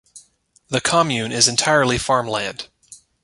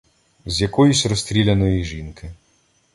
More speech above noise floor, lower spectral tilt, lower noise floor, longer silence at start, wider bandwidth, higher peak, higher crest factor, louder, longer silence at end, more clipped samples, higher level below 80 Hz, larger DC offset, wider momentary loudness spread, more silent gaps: second, 39 dB vs 43 dB; second, -2.5 dB/octave vs -5 dB/octave; second, -57 dBFS vs -61 dBFS; second, 0.15 s vs 0.45 s; about the same, 11.5 kHz vs 11.5 kHz; about the same, -2 dBFS vs -4 dBFS; about the same, 20 dB vs 16 dB; about the same, -18 LUFS vs -18 LUFS; second, 0.3 s vs 0.6 s; neither; second, -48 dBFS vs -36 dBFS; neither; second, 12 LU vs 22 LU; neither